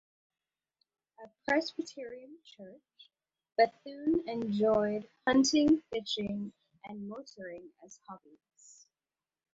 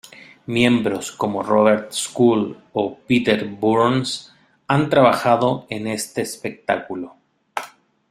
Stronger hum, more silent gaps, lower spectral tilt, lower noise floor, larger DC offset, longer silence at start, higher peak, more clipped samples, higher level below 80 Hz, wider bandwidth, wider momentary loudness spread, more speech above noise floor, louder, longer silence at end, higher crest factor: neither; neither; about the same, -4 dB/octave vs -5 dB/octave; first, under -90 dBFS vs -42 dBFS; neither; first, 1.2 s vs 0.5 s; second, -14 dBFS vs -2 dBFS; neither; second, -68 dBFS vs -58 dBFS; second, 8 kHz vs 15.5 kHz; first, 25 LU vs 15 LU; first, over 57 dB vs 23 dB; second, -31 LUFS vs -19 LUFS; first, 1.35 s vs 0.45 s; about the same, 22 dB vs 18 dB